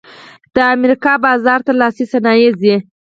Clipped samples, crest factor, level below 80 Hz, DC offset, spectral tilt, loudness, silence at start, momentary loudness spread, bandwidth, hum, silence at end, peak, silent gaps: under 0.1%; 12 dB; -54 dBFS; under 0.1%; -6.5 dB/octave; -12 LUFS; 0.55 s; 4 LU; 7.6 kHz; none; 0.25 s; 0 dBFS; none